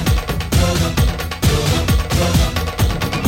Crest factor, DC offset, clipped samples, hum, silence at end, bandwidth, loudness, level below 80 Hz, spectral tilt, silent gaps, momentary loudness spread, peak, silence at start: 12 dB; under 0.1%; under 0.1%; none; 0 s; 16.5 kHz; -17 LUFS; -22 dBFS; -5 dB/octave; none; 3 LU; -4 dBFS; 0 s